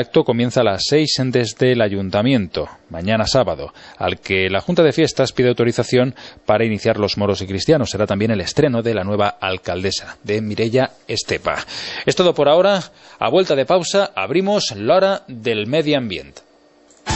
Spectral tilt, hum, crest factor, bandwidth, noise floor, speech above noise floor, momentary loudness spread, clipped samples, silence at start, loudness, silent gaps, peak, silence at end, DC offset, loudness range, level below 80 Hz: -5 dB/octave; none; 16 dB; 8.4 kHz; -51 dBFS; 34 dB; 8 LU; under 0.1%; 0 s; -18 LUFS; none; -2 dBFS; 0 s; under 0.1%; 3 LU; -48 dBFS